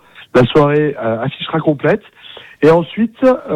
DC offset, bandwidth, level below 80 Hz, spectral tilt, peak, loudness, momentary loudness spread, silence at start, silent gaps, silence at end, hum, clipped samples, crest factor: under 0.1%; 9.6 kHz; -46 dBFS; -8 dB/octave; -2 dBFS; -14 LUFS; 8 LU; 0.2 s; none; 0 s; none; under 0.1%; 12 dB